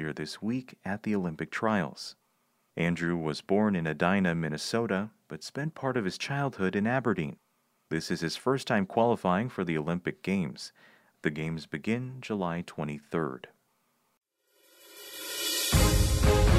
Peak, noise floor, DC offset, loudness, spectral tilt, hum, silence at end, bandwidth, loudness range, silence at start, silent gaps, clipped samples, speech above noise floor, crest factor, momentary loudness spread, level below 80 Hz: -10 dBFS; -73 dBFS; under 0.1%; -30 LUFS; -5 dB/octave; none; 0 s; 15 kHz; 5 LU; 0 s; 14.17-14.21 s; under 0.1%; 43 dB; 20 dB; 12 LU; -38 dBFS